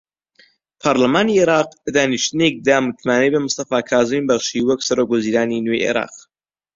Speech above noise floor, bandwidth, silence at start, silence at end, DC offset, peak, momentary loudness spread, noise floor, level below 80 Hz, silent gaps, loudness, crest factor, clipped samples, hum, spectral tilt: 61 dB; 7.8 kHz; 0.85 s; 0.55 s; under 0.1%; 0 dBFS; 5 LU; -78 dBFS; -56 dBFS; none; -17 LUFS; 18 dB; under 0.1%; none; -4 dB/octave